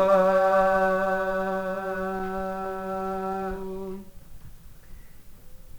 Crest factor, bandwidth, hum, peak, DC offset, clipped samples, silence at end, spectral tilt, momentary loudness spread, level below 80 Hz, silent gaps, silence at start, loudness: 18 dB; over 20 kHz; none; -8 dBFS; under 0.1%; under 0.1%; 0 s; -6.5 dB/octave; 14 LU; -46 dBFS; none; 0 s; -26 LUFS